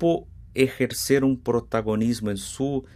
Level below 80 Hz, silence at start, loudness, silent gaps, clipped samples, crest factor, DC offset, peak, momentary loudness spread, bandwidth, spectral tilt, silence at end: -48 dBFS; 0 s; -24 LUFS; none; under 0.1%; 18 dB; under 0.1%; -6 dBFS; 7 LU; 15.5 kHz; -5.5 dB/octave; 0.1 s